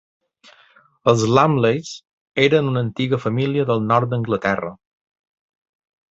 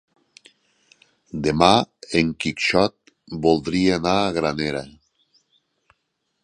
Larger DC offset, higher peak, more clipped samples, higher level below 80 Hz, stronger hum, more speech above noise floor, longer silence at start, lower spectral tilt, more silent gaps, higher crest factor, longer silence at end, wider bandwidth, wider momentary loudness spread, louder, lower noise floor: neither; about the same, -2 dBFS vs 0 dBFS; neither; second, -56 dBFS vs -48 dBFS; neither; second, 36 dB vs 54 dB; second, 1.05 s vs 1.35 s; about the same, -6 dB/octave vs -5 dB/octave; first, 2.13-2.32 s vs none; about the same, 20 dB vs 22 dB; second, 1.35 s vs 1.55 s; second, 8 kHz vs 11 kHz; about the same, 11 LU vs 10 LU; about the same, -19 LUFS vs -20 LUFS; second, -54 dBFS vs -74 dBFS